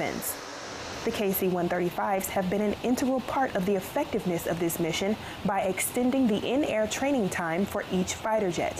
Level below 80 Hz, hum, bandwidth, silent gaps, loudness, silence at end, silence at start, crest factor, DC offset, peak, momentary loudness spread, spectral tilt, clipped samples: -56 dBFS; none; 16 kHz; none; -28 LUFS; 0 s; 0 s; 10 dB; under 0.1%; -18 dBFS; 5 LU; -4.5 dB/octave; under 0.1%